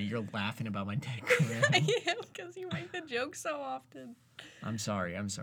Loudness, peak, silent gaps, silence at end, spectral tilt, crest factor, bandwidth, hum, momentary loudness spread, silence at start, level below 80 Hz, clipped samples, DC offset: -33 LUFS; -12 dBFS; none; 0 s; -4.5 dB/octave; 22 dB; 19.5 kHz; none; 17 LU; 0 s; -74 dBFS; under 0.1%; under 0.1%